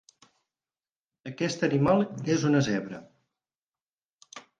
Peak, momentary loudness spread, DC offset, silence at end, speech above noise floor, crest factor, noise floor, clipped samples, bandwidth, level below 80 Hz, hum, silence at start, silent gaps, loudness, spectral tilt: -10 dBFS; 21 LU; under 0.1%; 0.2 s; over 64 dB; 20 dB; under -90 dBFS; under 0.1%; 9.4 kHz; -64 dBFS; none; 1.25 s; 3.63-3.67 s, 3.82-3.86 s, 3.93-3.98 s, 4.05-4.19 s; -26 LUFS; -6 dB/octave